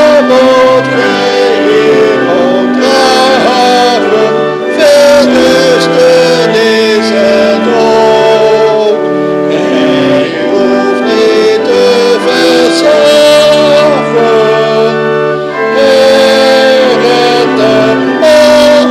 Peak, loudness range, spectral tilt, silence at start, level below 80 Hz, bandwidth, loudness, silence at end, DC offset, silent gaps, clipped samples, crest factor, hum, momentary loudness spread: 0 dBFS; 2 LU; -4 dB/octave; 0 s; -46 dBFS; 15.5 kHz; -6 LUFS; 0 s; under 0.1%; none; 1%; 6 dB; none; 5 LU